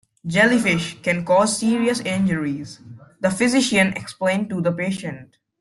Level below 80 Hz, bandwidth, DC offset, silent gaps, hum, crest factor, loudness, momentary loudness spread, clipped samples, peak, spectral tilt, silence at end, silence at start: -58 dBFS; 12.5 kHz; under 0.1%; none; none; 16 dB; -20 LUFS; 11 LU; under 0.1%; -4 dBFS; -4.5 dB/octave; 0.35 s; 0.25 s